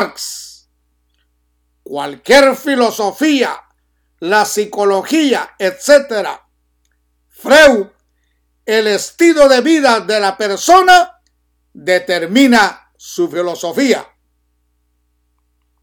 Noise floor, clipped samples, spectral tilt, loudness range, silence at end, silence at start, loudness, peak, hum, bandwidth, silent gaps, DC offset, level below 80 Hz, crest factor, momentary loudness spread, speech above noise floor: -62 dBFS; 0.1%; -2.5 dB/octave; 4 LU; 1.8 s; 0 s; -12 LUFS; 0 dBFS; 60 Hz at -45 dBFS; 18.5 kHz; none; under 0.1%; -50 dBFS; 14 dB; 16 LU; 50 dB